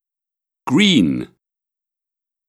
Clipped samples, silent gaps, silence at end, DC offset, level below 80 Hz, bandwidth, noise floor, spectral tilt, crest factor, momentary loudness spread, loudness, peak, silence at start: under 0.1%; none; 1.2 s; under 0.1%; -56 dBFS; 12.5 kHz; -87 dBFS; -5 dB/octave; 18 dB; 20 LU; -16 LUFS; -2 dBFS; 0.65 s